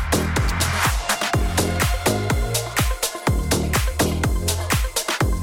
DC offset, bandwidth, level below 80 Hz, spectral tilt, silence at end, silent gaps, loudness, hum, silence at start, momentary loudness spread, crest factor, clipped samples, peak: under 0.1%; 17 kHz; -26 dBFS; -4 dB/octave; 0 s; none; -21 LUFS; none; 0 s; 2 LU; 12 dB; under 0.1%; -8 dBFS